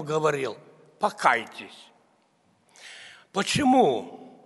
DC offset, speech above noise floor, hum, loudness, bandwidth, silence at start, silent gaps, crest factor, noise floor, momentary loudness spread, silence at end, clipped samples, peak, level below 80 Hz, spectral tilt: under 0.1%; 41 dB; none; -24 LUFS; 11.5 kHz; 0 s; none; 22 dB; -65 dBFS; 24 LU; 0.15 s; under 0.1%; -4 dBFS; -64 dBFS; -4.5 dB/octave